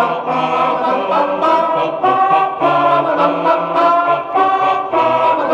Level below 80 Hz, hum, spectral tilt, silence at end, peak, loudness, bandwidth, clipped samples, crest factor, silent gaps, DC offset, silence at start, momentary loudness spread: -58 dBFS; none; -6 dB/octave; 0 s; -2 dBFS; -14 LUFS; 8.2 kHz; under 0.1%; 12 dB; none; under 0.1%; 0 s; 3 LU